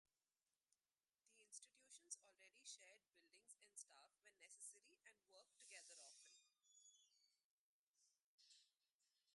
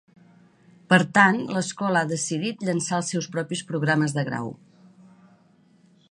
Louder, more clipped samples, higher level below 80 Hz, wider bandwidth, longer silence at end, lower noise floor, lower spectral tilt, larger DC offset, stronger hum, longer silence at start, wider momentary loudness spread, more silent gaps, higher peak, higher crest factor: second, -62 LUFS vs -23 LUFS; neither; second, under -90 dBFS vs -70 dBFS; about the same, 11.5 kHz vs 11 kHz; second, 0 s vs 1.55 s; first, under -90 dBFS vs -58 dBFS; second, 3 dB/octave vs -4.5 dB/octave; neither; neither; second, 0.7 s vs 0.9 s; about the same, 9 LU vs 11 LU; first, 7.45-7.94 s, 8.22-8.38 s, 8.92-9.00 s vs none; second, -40 dBFS vs -2 dBFS; first, 30 dB vs 24 dB